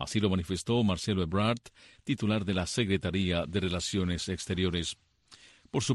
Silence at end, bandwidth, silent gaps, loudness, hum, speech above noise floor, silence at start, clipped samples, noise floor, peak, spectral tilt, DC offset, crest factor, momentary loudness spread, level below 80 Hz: 0 s; 12 kHz; none; -31 LUFS; none; 28 dB; 0 s; under 0.1%; -58 dBFS; -14 dBFS; -5 dB/octave; under 0.1%; 16 dB; 7 LU; -52 dBFS